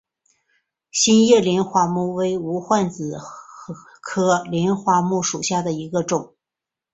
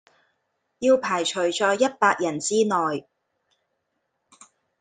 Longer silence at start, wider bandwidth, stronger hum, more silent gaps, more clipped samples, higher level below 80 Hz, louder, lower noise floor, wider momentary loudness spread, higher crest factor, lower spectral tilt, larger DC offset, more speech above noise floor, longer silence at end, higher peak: first, 0.95 s vs 0.8 s; second, 8.4 kHz vs 9.6 kHz; neither; neither; neither; first, -60 dBFS vs -72 dBFS; about the same, -20 LUFS vs -22 LUFS; first, -87 dBFS vs -76 dBFS; first, 20 LU vs 5 LU; about the same, 18 dB vs 20 dB; first, -4.5 dB/octave vs -3 dB/octave; neither; first, 68 dB vs 54 dB; second, 0.7 s vs 1.8 s; about the same, -2 dBFS vs -4 dBFS